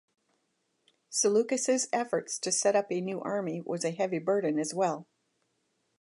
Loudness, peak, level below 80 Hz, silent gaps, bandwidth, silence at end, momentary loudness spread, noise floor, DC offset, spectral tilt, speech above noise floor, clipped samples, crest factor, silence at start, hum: -29 LUFS; -14 dBFS; -84 dBFS; none; 11.5 kHz; 1 s; 7 LU; -77 dBFS; under 0.1%; -3.5 dB/octave; 48 dB; under 0.1%; 18 dB; 1.1 s; none